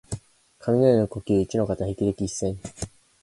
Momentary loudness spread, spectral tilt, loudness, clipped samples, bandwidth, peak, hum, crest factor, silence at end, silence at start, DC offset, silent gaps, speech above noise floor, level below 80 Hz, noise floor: 18 LU; -7 dB/octave; -24 LUFS; under 0.1%; 11.5 kHz; -6 dBFS; none; 18 dB; 0.35 s; 0.1 s; under 0.1%; none; 28 dB; -46 dBFS; -51 dBFS